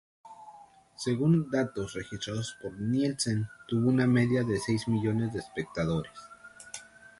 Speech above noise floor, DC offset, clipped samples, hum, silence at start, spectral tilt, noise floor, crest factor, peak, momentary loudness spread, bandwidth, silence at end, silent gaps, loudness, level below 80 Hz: 25 dB; under 0.1%; under 0.1%; none; 0.25 s; -6 dB/octave; -54 dBFS; 16 dB; -14 dBFS; 19 LU; 11.5 kHz; 0.35 s; none; -30 LUFS; -58 dBFS